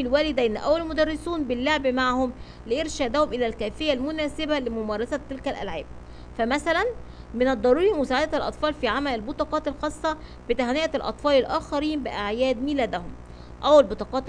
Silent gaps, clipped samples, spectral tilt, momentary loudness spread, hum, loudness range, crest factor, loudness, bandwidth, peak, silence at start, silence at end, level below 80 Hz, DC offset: none; under 0.1%; -5 dB/octave; 11 LU; 60 Hz at -45 dBFS; 3 LU; 20 dB; -25 LUFS; 10 kHz; -4 dBFS; 0 s; 0 s; -42 dBFS; under 0.1%